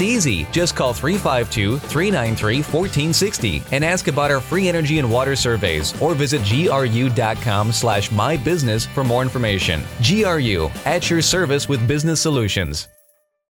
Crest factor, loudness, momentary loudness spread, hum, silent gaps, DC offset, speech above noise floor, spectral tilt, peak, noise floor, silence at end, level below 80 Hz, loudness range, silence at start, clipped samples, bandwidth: 14 dB; -18 LUFS; 3 LU; none; none; under 0.1%; 40 dB; -4.5 dB/octave; -4 dBFS; -58 dBFS; 0.7 s; -38 dBFS; 1 LU; 0 s; under 0.1%; over 20 kHz